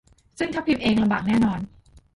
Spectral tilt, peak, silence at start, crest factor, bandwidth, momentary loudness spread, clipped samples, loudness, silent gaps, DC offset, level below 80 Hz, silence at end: -6.5 dB/octave; -10 dBFS; 0.4 s; 14 dB; 11.5 kHz; 11 LU; under 0.1%; -23 LUFS; none; under 0.1%; -48 dBFS; 0.5 s